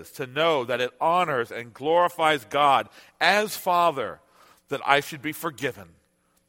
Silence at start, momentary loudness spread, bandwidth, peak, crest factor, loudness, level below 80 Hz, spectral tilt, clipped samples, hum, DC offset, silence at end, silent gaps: 0 s; 12 LU; 17 kHz; -2 dBFS; 24 dB; -24 LUFS; -68 dBFS; -3.5 dB/octave; under 0.1%; none; under 0.1%; 0.65 s; none